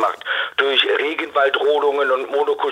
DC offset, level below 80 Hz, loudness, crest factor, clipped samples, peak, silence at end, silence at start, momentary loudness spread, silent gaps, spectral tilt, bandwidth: under 0.1%; -70 dBFS; -18 LUFS; 16 dB; under 0.1%; -2 dBFS; 0 s; 0 s; 5 LU; none; -2 dB/octave; 10.5 kHz